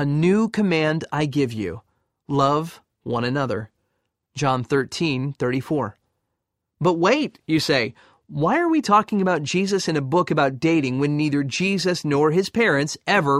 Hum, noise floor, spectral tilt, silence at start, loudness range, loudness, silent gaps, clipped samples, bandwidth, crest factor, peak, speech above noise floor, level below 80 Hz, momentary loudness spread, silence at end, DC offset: none; -79 dBFS; -5.5 dB/octave; 0 s; 5 LU; -21 LUFS; none; under 0.1%; 14.5 kHz; 18 dB; -4 dBFS; 58 dB; -58 dBFS; 8 LU; 0 s; under 0.1%